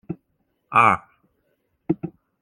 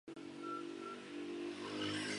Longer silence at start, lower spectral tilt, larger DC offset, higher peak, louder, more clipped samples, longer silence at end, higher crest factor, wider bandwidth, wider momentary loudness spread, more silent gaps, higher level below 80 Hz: about the same, 0.1 s vs 0.05 s; first, -6.5 dB/octave vs -3.5 dB/octave; neither; first, -2 dBFS vs -28 dBFS; first, -21 LUFS vs -45 LUFS; neither; first, 0.35 s vs 0 s; first, 24 dB vs 16 dB; about the same, 12 kHz vs 11.5 kHz; first, 21 LU vs 7 LU; neither; first, -60 dBFS vs -80 dBFS